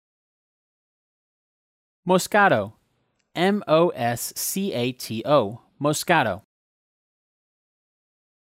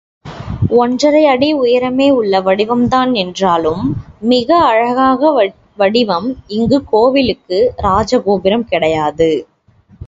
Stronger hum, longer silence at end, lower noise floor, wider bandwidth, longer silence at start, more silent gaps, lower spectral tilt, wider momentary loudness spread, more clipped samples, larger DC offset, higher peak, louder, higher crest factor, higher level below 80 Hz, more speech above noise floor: neither; first, 2.05 s vs 0 s; first, -71 dBFS vs -48 dBFS; first, 16 kHz vs 7.8 kHz; first, 2.05 s vs 0.25 s; neither; second, -4.5 dB/octave vs -6 dB/octave; first, 13 LU vs 8 LU; neither; neither; second, -6 dBFS vs 0 dBFS; second, -22 LUFS vs -13 LUFS; first, 20 dB vs 12 dB; second, -70 dBFS vs -38 dBFS; first, 49 dB vs 36 dB